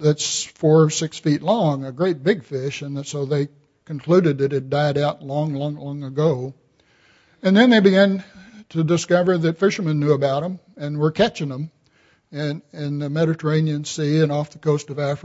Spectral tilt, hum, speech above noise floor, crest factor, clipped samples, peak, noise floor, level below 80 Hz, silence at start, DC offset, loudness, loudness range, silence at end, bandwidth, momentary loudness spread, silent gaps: -6 dB/octave; none; 39 dB; 18 dB; under 0.1%; -2 dBFS; -59 dBFS; -62 dBFS; 0 s; under 0.1%; -20 LUFS; 5 LU; 0.05 s; 8 kHz; 13 LU; none